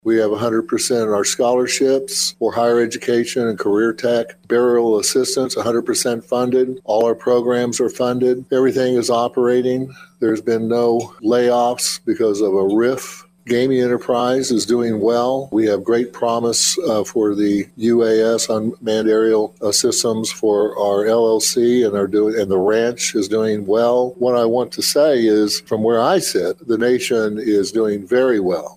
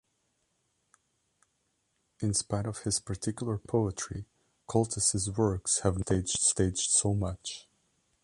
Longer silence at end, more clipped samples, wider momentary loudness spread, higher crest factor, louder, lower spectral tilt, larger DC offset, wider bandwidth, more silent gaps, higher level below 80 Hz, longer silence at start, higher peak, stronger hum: second, 0.05 s vs 0.6 s; neither; second, 4 LU vs 11 LU; second, 14 dB vs 22 dB; first, -17 LUFS vs -29 LUFS; about the same, -3.5 dB/octave vs -4 dB/octave; neither; first, 16 kHz vs 11.5 kHz; neither; second, -60 dBFS vs -50 dBFS; second, 0.05 s vs 2.2 s; first, -2 dBFS vs -10 dBFS; neither